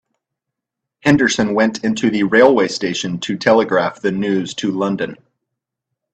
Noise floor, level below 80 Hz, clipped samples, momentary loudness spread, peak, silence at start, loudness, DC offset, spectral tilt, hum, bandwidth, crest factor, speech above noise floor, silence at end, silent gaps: -82 dBFS; -54 dBFS; under 0.1%; 9 LU; 0 dBFS; 1.05 s; -16 LUFS; under 0.1%; -5 dB/octave; none; 9 kHz; 18 dB; 66 dB; 1 s; none